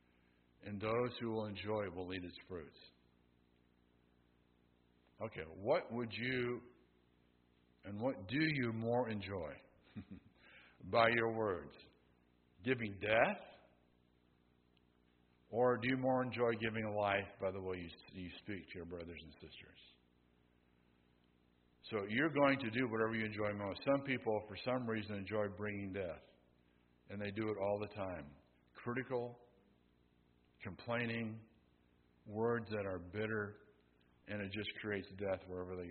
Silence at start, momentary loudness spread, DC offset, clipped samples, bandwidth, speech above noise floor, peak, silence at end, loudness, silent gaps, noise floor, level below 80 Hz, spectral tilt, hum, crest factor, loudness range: 0.65 s; 17 LU; under 0.1%; under 0.1%; 4.5 kHz; 34 dB; -16 dBFS; 0 s; -40 LUFS; none; -74 dBFS; -72 dBFS; -4.5 dB/octave; 60 Hz at -75 dBFS; 26 dB; 10 LU